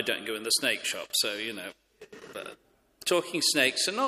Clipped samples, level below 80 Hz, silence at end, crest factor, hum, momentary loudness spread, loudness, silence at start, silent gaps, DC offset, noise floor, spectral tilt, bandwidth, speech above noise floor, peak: under 0.1%; -74 dBFS; 0 s; 20 dB; none; 19 LU; -27 LUFS; 0 s; none; under 0.1%; -49 dBFS; -1 dB/octave; 15.5 kHz; 20 dB; -10 dBFS